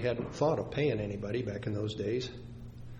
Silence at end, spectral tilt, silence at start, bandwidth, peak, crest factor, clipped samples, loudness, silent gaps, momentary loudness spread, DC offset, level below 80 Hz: 0 s; -7 dB/octave; 0 s; 9.4 kHz; -16 dBFS; 18 dB; under 0.1%; -34 LUFS; none; 13 LU; under 0.1%; -54 dBFS